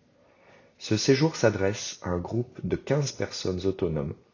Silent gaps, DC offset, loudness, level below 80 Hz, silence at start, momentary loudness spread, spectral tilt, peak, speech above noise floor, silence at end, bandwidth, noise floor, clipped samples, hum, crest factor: none; under 0.1%; -27 LUFS; -48 dBFS; 0.8 s; 10 LU; -5.5 dB/octave; -8 dBFS; 32 dB; 0.2 s; 7.4 kHz; -59 dBFS; under 0.1%; none; 20 dB